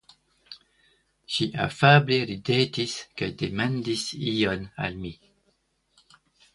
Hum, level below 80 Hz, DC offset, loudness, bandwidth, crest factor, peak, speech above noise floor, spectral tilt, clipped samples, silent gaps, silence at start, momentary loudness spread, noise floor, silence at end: none; -56 dBFS; under 0.1%; -25 LUFS; 11.5 kHz; 24 dB; -2 dBFS; 45 dB; -5.5 dB/octave; under 0.1%; none; 0.5 s; 21 LU; -70 dBFS; 1.4 s